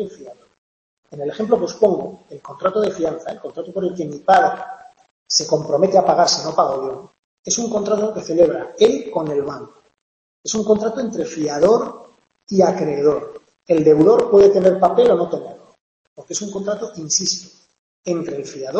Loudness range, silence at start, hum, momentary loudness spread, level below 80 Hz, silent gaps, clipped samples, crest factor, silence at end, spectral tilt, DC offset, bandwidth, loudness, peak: 7 LU; 0 s; none; 16 LU; -58 dBFS; 0.58-1.03 s, 5.11-5.26 s, 7.19-7.43 s, 10.01-10.44 s, 15.81-16.16 s, 17.79-18.03 s; under 0.1%; 16 dB; 0 s; -4 dB/octave; under 0.1%; 8.4 kHz; -18 LUFS; -2 dBFS